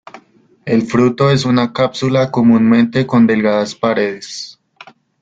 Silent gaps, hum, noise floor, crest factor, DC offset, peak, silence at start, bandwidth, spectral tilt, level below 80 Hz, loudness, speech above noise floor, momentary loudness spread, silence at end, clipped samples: none; none; -48 dBFS; 14 dB; under 0.1%; 0 dBFS; 0.15 s; 7.8 kHz; -6.5 dB/octave; -50 dBFS; -13 LUFS; 35 dB; 14 LU; 0.7 s; under 0.1%